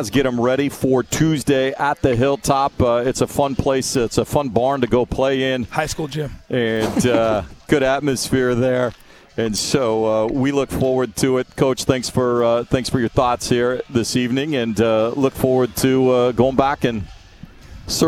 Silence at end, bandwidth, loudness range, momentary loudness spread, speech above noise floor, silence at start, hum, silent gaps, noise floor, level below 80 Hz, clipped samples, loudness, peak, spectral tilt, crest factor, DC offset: 0 s; 19.5 kHz; 2 LU; 5 LU; 23 dB; 0 s; none; none; -41 dBFS; -40 dBFS; under 0.1%; -18 LUFS; 0 dBFS; -5 dB/octave; 18 dB; under 0.1%